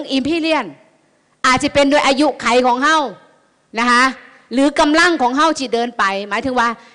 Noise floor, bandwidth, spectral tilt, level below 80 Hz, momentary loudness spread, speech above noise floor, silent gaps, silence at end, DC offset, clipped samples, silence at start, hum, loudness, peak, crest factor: -57 dBFS; 10.5 kHz; -3 dB/octave; -48 dBFS; 8 LU; 42 dB; none; 0.2 s; under 0.1%; under 0.1%; 0 s; none; -15 LUFS; -6 dBFS; 10 dB